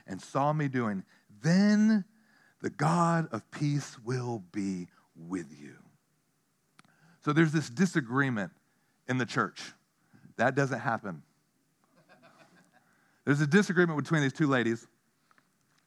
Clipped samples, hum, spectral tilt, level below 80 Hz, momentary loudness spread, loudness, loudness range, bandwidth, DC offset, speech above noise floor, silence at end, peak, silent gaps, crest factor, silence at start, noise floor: under 0.1%; none; -6.5 dB/octave; -84 dBFS; 15 LU; -29 LUFS; 7 LU; 12 kHz; under 0.1%; 46 dB; 1.05 s; -10 dBFS; none; 20 dB; 0.1 s; -74 dBFS